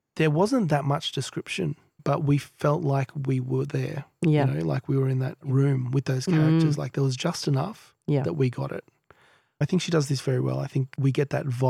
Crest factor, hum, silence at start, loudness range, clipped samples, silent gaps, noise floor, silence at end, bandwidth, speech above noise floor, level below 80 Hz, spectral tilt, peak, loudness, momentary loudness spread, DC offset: 16 dB; none; 0.15 s; 3 LU; under 0.1%; none; -59 dBFS; 0 s; 13 kHz; 34 dB; -62 dBFS; -7 dB/octave; -10 dBFS; -26 LUFS; 8 LU; under 0.1%